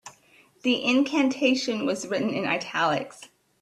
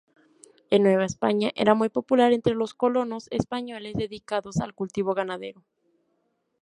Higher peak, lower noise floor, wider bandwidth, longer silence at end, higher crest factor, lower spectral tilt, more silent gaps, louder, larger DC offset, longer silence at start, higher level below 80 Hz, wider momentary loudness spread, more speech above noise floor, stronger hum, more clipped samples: second, -10 dBFS vs -4 dBFS; second, -58 dBFS vs -73 dBFS; about the same, 12 kHz vs 11 kHz; second, 0.35 s vs 1.1 s; about the same, 16 dB vs 20 dB; second, -4 dB/octave vs -6 dB/octave; neither; about the same, -25 LUFS vs -25 LUFS; neither; second, 0.05 s vs 0.7 s; second, -70 dBFS vs -58 dBFS; second, 7 LU vs 11 LU; second, 34 dB vs 49 dB; neither; neither